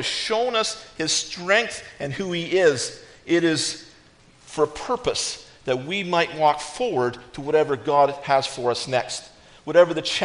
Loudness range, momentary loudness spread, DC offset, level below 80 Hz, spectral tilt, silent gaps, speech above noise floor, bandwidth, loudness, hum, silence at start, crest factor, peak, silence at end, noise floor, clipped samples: 3 LU; 12 LU; under 0.1%; -56 dBFS; -3 dB/octave; none; 30 dB; 10.5 kHz; -22 LUFS; none; 0 s; 20 dB; -4 dBFS; 0 s; -53 dBFS; under 0.1%